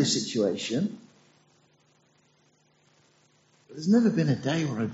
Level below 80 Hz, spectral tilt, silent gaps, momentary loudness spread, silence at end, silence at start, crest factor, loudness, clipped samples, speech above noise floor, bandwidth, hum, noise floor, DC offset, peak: -68 dBFS; -5.5 dB/octave; none; 11 LU; 0 s; 0 s; 18 dB; -26 LUFS; under 0.1%; 40 dB; 8 kHz; none; -65 dBFS; under 0.1%; -12 dBFS